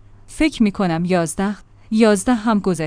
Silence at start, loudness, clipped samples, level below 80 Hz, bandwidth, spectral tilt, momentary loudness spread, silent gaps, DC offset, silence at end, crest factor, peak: 0.3 s; -18 LUFS; under 0.1%; -40 dBFS; 10.5 kHz; -5.5 dB/octave; 8 LU; none; under 0.1%; 0 s; 18 dB; 0 dBFS